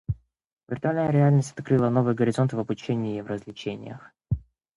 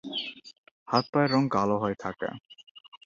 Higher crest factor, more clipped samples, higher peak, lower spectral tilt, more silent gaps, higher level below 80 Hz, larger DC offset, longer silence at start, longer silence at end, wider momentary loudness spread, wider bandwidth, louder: about the same, 16 dB vs 20 dB; neither; about the same, -8 dBFS vs -8 dBFS; first, -8 dB/octave vs -6.5 dB/octave; second, 0.52-0.56 s vs 0.58-0.64 s, 0.71-0.86 s, 1.09-1.13 s, 2.71-2.75 s, 2.88-2.92 s; first, -48 dBFS vs -64 dBFS; neither; about the same, 0.1 s vs 0.05 s; first, 0.35 s vs 0.1 s; about the same, 14 LU vs 14 LU; first, 11 kHz vs 7.6 kHz; first, -25 LUFS vs -28 LUFS